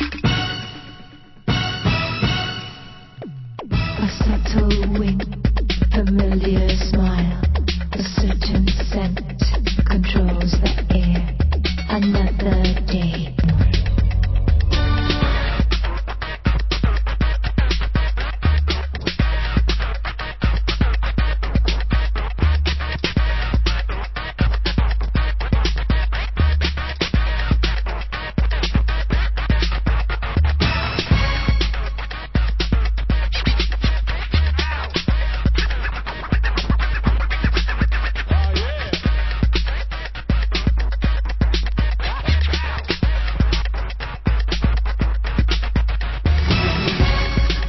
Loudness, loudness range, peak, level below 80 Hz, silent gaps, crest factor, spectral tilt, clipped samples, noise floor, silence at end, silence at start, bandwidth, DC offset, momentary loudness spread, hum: -20 LUFS; 2 LU; -4 dBFS; -20 dBFS; none; 14 dB; -6.5 dB/octave; under 0.1%; -41 dBFS; 0 s; 0 s; 6 kHz; under 0.1%; 6 LU; none